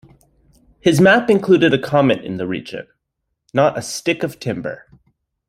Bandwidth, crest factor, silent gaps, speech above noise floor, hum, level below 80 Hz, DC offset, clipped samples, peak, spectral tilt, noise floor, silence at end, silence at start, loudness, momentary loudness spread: 15 kHz; 16 dB; none; 59 dB; none; -54 dBFS; under 0.1%; under 0.1%; -2 dBFS; -5.5 dB/octave; -76 dBFS; 0.75 s; 0.85 s; -17 LUFS; 15 LU